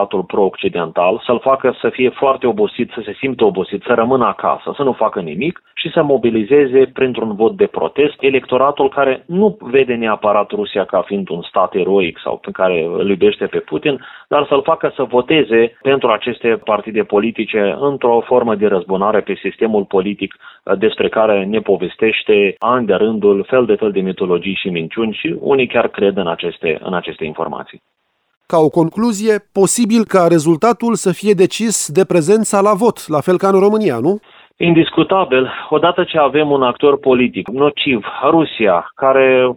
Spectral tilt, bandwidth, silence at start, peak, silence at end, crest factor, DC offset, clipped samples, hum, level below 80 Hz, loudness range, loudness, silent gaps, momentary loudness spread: -5 dB/octave; 16.5 kHz; 0 s; 0 dBFS; 0 s; 14 dB; under 0.1%; under 0.1%; none; -54 dBFS; 3 LU; -15 LUFS; 28.37-28.41 s; 7 LU